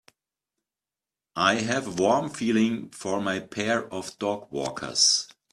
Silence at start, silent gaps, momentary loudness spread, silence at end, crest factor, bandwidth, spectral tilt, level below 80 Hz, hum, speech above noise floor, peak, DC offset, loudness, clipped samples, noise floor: 1.35 s; none; 11 LU; 0.25 s; 22 dB; 13 kHz; -3 dB/octave; -66 dBFS; none; over 64 dB; -6 dBFS; under 0.1%; -25 LUFS; under 0.1%; under -90 dBFS